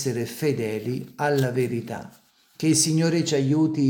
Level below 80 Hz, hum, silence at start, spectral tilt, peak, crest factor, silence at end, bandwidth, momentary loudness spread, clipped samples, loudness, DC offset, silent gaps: -66 dBFS; none; 0 s; -5 dB/octave; -6 dBFS; 16 dB; 0 s; 18 kHz; 11 LU; under 0.1%; -23 LUFS; under 0.1%; none